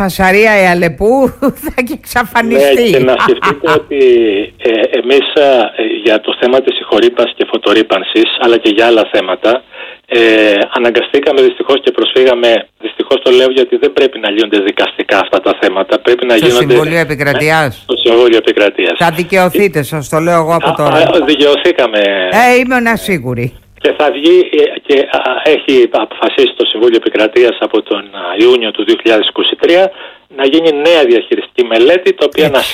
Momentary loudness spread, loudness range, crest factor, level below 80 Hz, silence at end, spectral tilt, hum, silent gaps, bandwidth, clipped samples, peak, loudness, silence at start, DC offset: 6 LU; 1 LU; 10 dB; -42 dBFS; 0 s; -5 dB/octave; none; none; 16 kHz; under 0.1%; 0 dBFS; -9 LUFS; 0 s; under 0.1%